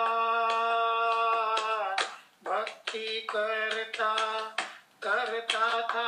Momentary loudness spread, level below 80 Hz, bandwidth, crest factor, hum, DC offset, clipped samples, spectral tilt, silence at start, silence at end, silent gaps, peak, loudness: 8 LU; under -90 dBFS; 13.5 kHz; 18 dB; none; under 0.1%; under 0.1%; 0 dB/octave; 0 s; 0 s; none; -12 dBFS; -29 LUFS